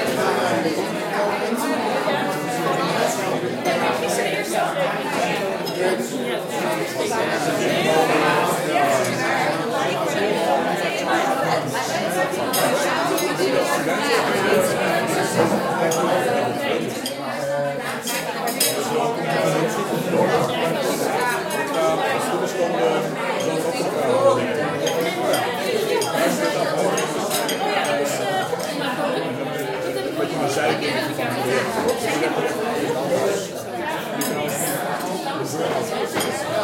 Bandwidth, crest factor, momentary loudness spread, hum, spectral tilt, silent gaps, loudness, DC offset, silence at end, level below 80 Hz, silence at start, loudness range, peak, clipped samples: 16.5 kHz; 18 dB; 5 LU; none; -4 dB/octave; none; -21 LUFS; under 0.1%; 0 s; -64 dBFS; 0 s; 3 LU; -4 dBFS; under 0.1%